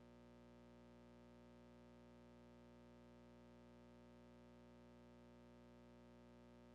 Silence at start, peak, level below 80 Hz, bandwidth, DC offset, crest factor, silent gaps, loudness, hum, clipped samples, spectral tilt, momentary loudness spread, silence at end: 0 s; -58 dBFS; -76 dBFS; 8 kHz; under 0.1%; 8 dB; none; -66 LUFS; 60 Hz at -65 dBFS; under 0.1%; -6 dB/octave; 0 LU; 0 s